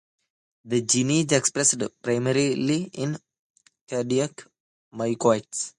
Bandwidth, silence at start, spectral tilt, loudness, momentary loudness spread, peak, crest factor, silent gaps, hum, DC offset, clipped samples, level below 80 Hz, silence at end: 11.5 kHz; 0.65 s; -4 dB/octave; -24 LUFS; 10 LU; -6 dBFS; 20 dB; 3.39-3.54 s, 3.81-3.87 s, 4.60-4.91 s; none; under 0.1%; under 0.1%; -66 dBFS; 0.1 s